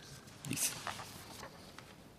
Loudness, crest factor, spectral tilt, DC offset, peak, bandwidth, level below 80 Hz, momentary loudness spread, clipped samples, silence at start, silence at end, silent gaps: -41 LUFS; 24 dB; -2 dB/octave; under 0.1%; -20 dBFS; 15.5 kHz; -70 dBFS; 18 LU; under 0.1%; 0 s; 0 s; none